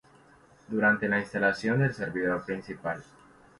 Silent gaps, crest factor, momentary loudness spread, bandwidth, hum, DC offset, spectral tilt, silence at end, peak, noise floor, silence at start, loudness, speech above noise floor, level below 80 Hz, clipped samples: none; 16 dB; 11 LU; 11.5 kHz; none; under 0.1%; -7 dB/octave; 0.55 s; -12 dBFS; -58 dBFS; 0.7 s; -28 LUFS; 30 dB; -62 dBFS; under 0.1%